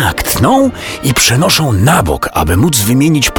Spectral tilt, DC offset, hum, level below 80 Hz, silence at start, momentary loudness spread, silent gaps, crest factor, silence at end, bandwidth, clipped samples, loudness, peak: -4 dB/octave; under 0.1%; none; -28 dBFS; 0 s; 5 LU; none; 10 dB; 0 s; over 20 kHz; under 0.1%; -10 LUFS; 0 dBFS